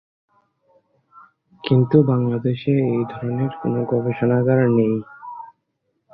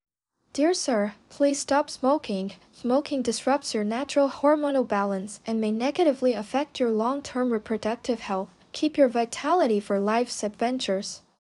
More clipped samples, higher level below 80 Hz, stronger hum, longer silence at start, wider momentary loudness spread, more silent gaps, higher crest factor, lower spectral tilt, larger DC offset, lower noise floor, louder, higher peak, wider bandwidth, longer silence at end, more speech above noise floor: neither; first, -56 dBFS vs -66 dBFS; neither; first, 1.65 s vs 0.55 s; first, 17 LU vs 8 LU; neither; about the same, 20 dB vs 16 dB; first, -12 dB/octave vs -4.5 dB/octave; neither; first, -72 dBFS vs -48 dBFS; first, -19 LUFS vs -26 LUFS; first, -2 dBFS vs -8 dBFS; second, 4.9 kHz vs 11.5 kHz; first, 0.65 s vs 0.25 s; first, 54 dB vs 23 dB